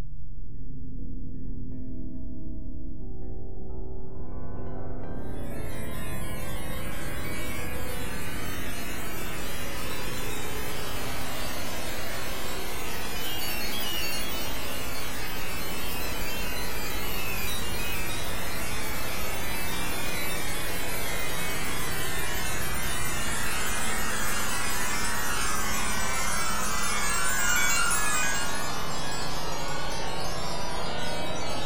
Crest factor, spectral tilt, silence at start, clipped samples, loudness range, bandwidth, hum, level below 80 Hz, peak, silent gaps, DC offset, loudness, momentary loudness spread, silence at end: 18 dB; -2.5 dB/octave; 0 s; under 0.1%; 13 LU; 16 kHz; none; -40 dBFS; -10 dBFS; none; 7%; -31 LUFS; 13 LU; 0 s